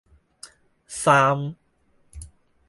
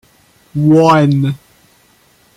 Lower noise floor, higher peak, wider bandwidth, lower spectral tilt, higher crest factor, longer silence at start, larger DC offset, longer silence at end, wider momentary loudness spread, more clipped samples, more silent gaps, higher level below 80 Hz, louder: first, -63 dBFS vs -51 dBFS; about the same, -4 dBFS vs -2 dBFS; about the same, 11.5 kHz vs 12 kHz; second, -4.5 dB/octave vs -8 dB/octave; first, 22 dB vs 12 dB; about the same, 0.45 s vs 0.55 s; neither; second, 0.4 s vs 1 s; first, 26 LU vs 16 LU; neither; neither; about the same, -52 dBFS vs -52 dBFS; second, -20 LUFS vs -11 LUFS